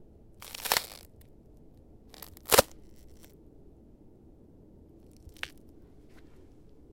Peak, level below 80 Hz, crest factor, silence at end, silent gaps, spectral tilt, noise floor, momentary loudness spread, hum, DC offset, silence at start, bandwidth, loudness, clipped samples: -4 dBFS; -56 dBFS; 32 dB; 1.45 s; none; -1.5 dB/octave; -55 dBFS; 29 LU; none; under 0.1%; 0.4 s; 17 kHz; -29 LUFS; under 0.1%